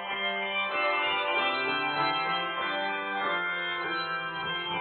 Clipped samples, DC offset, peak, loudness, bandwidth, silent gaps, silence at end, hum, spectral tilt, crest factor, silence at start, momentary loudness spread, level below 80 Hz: under 0.1%; under 0.1%; -14 dBFS; -28 LUFS; 4.7 kHz; none; 0 s; none; 0.5 dB/octave; 16 dB; 0 s; 4 LU; -74 dBFS